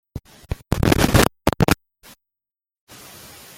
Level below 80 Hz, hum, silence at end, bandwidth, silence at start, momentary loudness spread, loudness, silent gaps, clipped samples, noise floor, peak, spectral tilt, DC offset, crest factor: -32 dBFS; none; 1.85 s; 17 kHz; 0.15 s; 24 LU; -19 LUFS; none; under 0.1%; -89 dBFS; 0 dBFS; -5 dB/octave; under 0.1%; 22 dB